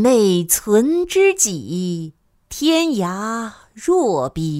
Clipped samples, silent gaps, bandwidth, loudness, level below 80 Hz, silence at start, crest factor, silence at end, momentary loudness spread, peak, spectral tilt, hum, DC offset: under 0.1%; none; 16 kHz; -17 LUFS; -48 dBFS; 0 s; 16 dB; 0 s; 12 LU; -2 dBFS; -4 dB/octave; none; under 0.1%